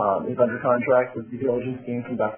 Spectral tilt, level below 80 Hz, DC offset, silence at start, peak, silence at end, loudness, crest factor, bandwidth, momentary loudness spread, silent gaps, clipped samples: -11 dB/octave; -62 dBFS; under 0.1%; 0 s; -8 dBFS; 0 s; -24 LUFS; 16 dB; 3.4 kHz; 10 LU; none; under 0.1%